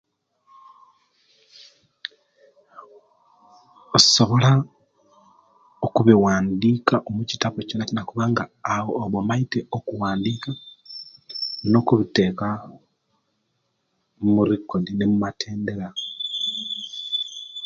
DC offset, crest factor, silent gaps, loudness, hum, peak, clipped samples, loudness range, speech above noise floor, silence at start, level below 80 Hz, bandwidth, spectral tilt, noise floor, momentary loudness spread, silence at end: under 0.1%; 24 dB; none; -22 LUFS; none; 0 dBFS; under 0.1%; 6 LU; 52 dB; 1.6 s; -56 dBFS; 9.2 kHz; -5 dB/octave; -73 dBFS; 17 LU; 0 s